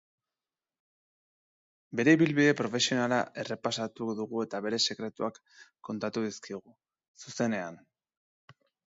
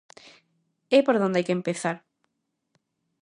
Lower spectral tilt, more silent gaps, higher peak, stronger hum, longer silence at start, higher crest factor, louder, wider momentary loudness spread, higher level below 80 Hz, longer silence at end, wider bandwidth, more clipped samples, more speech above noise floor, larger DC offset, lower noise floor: about the same, -4.5 dB/octave vs -5.5 dB/octave; first, 7.08-7.14 s vs none; second, -10 dBFS vs -6 dBFS; neither; first, 1.9 s vs 0.9 s; about the same, 22 dB vs 22 dB; second, -30 LUFS vs -24 LUFS; first, 18 LU vs 10 LU; about the same, -76 dBFS vs -76 dBFS; about the same, 1.2 s vs 1.25 s; second, 7.8 kHz vs 11 kHz; neither; first, over 60 dB vs 56 dB; neither; first, under -90 dBFS vs -79 dBFS